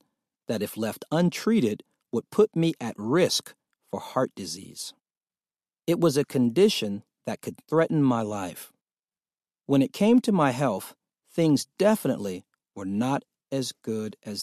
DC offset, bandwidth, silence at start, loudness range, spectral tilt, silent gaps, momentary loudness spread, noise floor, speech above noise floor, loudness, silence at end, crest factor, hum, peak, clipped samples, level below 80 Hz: under 0.1%; 14.5 kHz; 0.5 s; 4 LU; -5.5 dB/octave; 5.17-5.21 s, 8.99-9.03 s; 14 LU; under -90 dBFS; over 65 dB; -26 LUFS; 0 s; 18 dB; none; -8 dBFS; under 0.1%; -68 dBFS